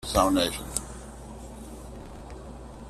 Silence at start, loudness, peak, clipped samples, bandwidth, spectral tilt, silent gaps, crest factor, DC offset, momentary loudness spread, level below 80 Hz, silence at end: 0 s; -26 LUFS; -8 dBFS; under 0.1%; 14.5 kHz; -4 dB/octave; none; 24 dB; under 0.1%; 20 LU; -42 dBFS; 0 s